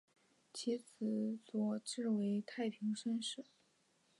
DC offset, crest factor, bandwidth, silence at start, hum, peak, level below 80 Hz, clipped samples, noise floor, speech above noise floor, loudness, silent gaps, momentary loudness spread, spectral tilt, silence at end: under 0.1%; 14 dB; 11.5 kHz; 0.55 s; none; -28 dBFS; under -90 dBFS; under 0.1%; -76 dBFS; 36 dB; -41 LUFS; none; 6 LU; -5 dB/octave; 0.75 s